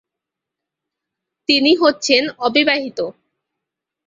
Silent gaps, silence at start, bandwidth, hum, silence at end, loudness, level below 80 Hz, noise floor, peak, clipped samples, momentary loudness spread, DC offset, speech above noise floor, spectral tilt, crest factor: none; 1.5 s; 7.8 kHz; none; 0.95 s; -15 LUFS; -64 dBFS; -84 dBFS; 0 dBFS; under 0.1%; 13 LU; under 0.1%; 68 dB; -2 dB/octave; 18 dB